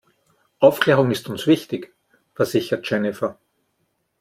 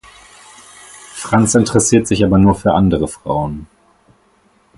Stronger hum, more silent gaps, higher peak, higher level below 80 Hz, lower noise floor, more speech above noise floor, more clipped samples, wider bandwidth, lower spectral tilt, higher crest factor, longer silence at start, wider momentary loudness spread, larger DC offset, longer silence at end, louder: neither; neither; about the same, -2 dBFS vs 0 dBFS; second, -62 dBFS vs -36 dBFS; first, -71 dBFS vs -55 dBFS; first, 52 dB vs 42 dB; neither; first, 16.5 kHz vs 11.5 kHz; about the same, -6 dB/octave vs -5.5 dB/octave; about the same, 20 dB vs 16 dB; second, 0.6 s vs 1.15 s; second, 12 LU vs 17 LU; neither; second, 0.9 s vs 1.15 s; second, -20 LUFS vs -14 LUFS